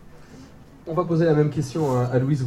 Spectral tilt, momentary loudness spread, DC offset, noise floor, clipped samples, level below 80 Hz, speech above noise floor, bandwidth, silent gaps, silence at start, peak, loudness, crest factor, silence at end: -8 dB/octave; 8 LU; under 0.1%; -45 dBFS; under 0.1%; -52 dBFS; 24 dB; 12 kHz; none; 0 s; -6 dBFS; -22 LUFS; 16 dB; 0 s